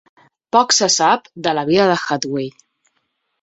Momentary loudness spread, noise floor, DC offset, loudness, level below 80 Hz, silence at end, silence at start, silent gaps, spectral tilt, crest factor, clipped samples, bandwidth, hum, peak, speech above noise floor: 10 LU; -70 dBFS; under 0.1%; -16 LUFS; -60 dBFS; 0.9 s; 0.55 s; none; -2.5 dB/octave; 18 dB; under 0.1%; 8.4 kHz; none; -2 dBFS; 53 dB